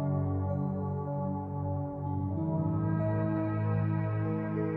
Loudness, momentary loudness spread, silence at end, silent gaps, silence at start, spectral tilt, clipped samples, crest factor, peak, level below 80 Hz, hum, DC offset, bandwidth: -32 LUFS; 5 LU; 0 s; none; 0 s; -12.5 dB/octave; under 0.1%; 12 dB; -20 dBFS; -58 dBFS; none; under 0.1%; 3 kHz